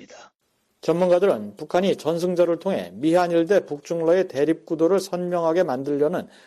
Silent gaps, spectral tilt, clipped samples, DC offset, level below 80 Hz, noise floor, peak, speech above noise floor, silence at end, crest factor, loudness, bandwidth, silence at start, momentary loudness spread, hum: 0.35-0.39 s; -6.5 dB/octave; under 0.1%; under 0.1%; -68 dBFS; -70 dBFS; -8 dBFS; 49 dB; 0.2 s; 14 dB; -22 LUFS; 13.5 kHz; 0 s; 6 LU; none